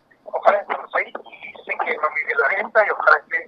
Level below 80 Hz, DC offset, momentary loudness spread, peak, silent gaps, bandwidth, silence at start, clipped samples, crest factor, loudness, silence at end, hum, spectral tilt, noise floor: -76 dBFS; under 0.1%; 14 LU; 0 dBFS; none; 6.6 kHz; 0.25 s; under 0.1%; 20 dB; -20 LUFS; 0 s; none; -3.5 dB/octave; -39 dBFS